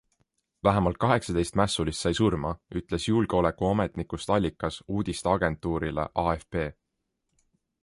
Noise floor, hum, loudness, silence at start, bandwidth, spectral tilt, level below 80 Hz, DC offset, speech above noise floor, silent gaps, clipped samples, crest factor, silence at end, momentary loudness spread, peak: -80 dBFS; none; -27 LUFS; 0.65 s; 11.5 kHz; -6 dB/octave; -44 dBFS; under 0.1%; 54 dB; none; under 0.1%; 20 dB; 1.1 s; 8 LU; -8 dBFS